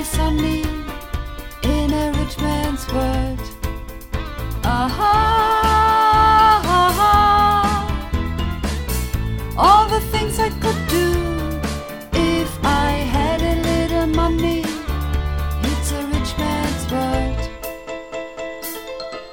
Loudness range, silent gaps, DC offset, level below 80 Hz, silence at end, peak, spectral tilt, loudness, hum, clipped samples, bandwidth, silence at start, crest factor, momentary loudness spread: 8 LU; none; 0.3%; -26 dBFS; 0 s; -2 dBFS; -5 dB/octave; -18 LUFS; none; under 0.1%; 18.5 kHz; 0 s; 18 dB; 16 LU